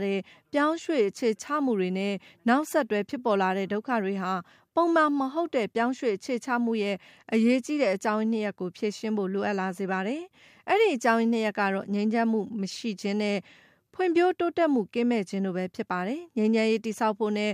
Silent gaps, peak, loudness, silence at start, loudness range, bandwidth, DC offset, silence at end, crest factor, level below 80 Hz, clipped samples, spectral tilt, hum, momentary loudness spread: none; -10 dBFS; -27 LUFS; 0 s; 1 LU; 15 kHz; under 0.1%; 0 s; 18 dB; -78 dBFS; under 0.1%; -5.5 dB/octave; none; 8 LU